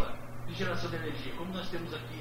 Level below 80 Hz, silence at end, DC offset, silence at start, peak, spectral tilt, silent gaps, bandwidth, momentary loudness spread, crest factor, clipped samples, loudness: -50 dBFS; 0 s; under 0.1%; 0 s; -16 dBFS; -5.5 dB/octave; none; 16 kHz; 6 LU; 18 dB; under 0.1%; -37 LUFS